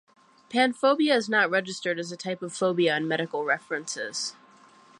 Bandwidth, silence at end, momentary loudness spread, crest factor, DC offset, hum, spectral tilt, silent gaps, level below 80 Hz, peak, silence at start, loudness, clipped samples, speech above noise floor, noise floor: 11.5 kHz; 0.65 s; 10 LU; 18 dB; under 0.1%; none; -3.5 dB/octave; none; -80 dBFS; -10 dBFS; 0.5 s; -26 LUFS; under 0.1%; 29 dB; -55 dBFS